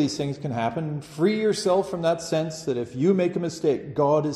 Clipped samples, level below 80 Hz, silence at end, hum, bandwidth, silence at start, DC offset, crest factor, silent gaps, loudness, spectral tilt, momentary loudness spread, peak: under 0.1%; -60 dBFS; 0 s; none; 13 kHz; 0 s; under 0.1%; 14 dB; none; -25 LUFS; -6 dB/octave; 7 LU; -8 dBFS